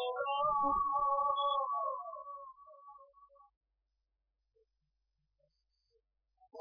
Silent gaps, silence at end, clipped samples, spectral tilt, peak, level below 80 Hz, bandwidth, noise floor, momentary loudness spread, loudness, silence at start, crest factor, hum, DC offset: 3.57-3.61 s; 0 s; under 0.1%; -6 dB/octave; -22 dBFS; -66 dBFS; 4 kHz; -85 dBFS; 16 LU; -34 LUFS; 0 s; 18 dB; none; under 0.1%